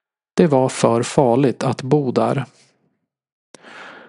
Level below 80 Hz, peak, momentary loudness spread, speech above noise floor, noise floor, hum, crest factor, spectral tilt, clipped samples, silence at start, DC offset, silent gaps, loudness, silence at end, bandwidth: -62 dBFS; 0 dBFS; 13 LU; 52 dB; -69 dBFS; none; 18 dB; -6.5 dB/octave; under 0.1%; 0.35 s; under 0.1%; 3.32-3.54 s; -18 LUFS; 0.1 s; 11.5 kHz